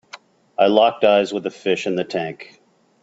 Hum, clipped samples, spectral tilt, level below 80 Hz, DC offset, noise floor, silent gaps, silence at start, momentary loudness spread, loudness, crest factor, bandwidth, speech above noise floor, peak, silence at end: none; under 0.1%; -5 dB/octave; -66 dBFS; under 0.1%; -44 dBFS; none; 0.15 s; 15 LU; -18 LUFS; 20 dB; 8 kHz; 26 dB; 0 dBFS; 0.6 s